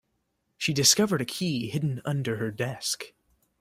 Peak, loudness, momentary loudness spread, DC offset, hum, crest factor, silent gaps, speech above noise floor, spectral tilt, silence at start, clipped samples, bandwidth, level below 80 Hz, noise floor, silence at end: -6 dBFS; -26 LUFS; 11 LU; under 0.1%; none; 22 dB; none; 49 dB; -3.5 dB/octave; 0.6 s; under 0.1%; 16 kHz; -64 dBFS; -76 dBFS; 0.55 s